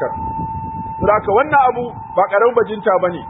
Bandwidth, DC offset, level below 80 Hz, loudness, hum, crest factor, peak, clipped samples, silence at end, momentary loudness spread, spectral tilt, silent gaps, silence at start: 3.9 kHz; under 0.1%; -42 dBFS; -16 LUFS; none; 16 dB; -2 dBFS; under 0.1%; 0 s; 11 LU; -11.5 dB/octave; none; 0 s